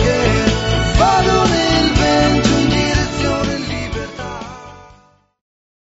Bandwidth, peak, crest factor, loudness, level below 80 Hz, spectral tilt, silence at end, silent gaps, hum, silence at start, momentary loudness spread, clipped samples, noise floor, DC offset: 8 kHz; 0 dBFS; 16 dB; -15 LUFS; -26 dBFS; -4 dB/octave; 1.1 s; none; none; 0 s; 14 LU; under 0.1%; -50 dBFS; under 0.1%